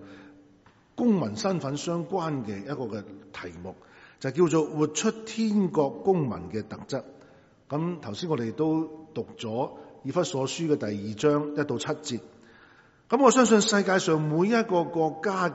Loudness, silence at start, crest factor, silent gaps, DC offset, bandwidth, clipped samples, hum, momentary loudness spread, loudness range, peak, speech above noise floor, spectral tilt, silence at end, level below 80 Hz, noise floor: -27 LUFS; 0 s; 22 dB; none; under 0.1%; 8 kHz; under 0.1%; none; 14 LU; 8 LU; -6 dBFS; 32 dB; -5 dB/octave; 0 s; -66 dBFS; -58 dBFS